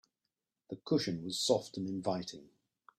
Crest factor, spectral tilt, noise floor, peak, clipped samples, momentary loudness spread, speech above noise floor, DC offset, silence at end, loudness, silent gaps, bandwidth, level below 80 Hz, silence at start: 22 dB; -4.5 dB/octave; -89 dBFS; -14 dBFS; under 0.1%; 16 LU; 54 dB; under 0.1%; 0.55 s; -35 LUFS; none; 15.5 kHz; -74 dBFS; 0.7 s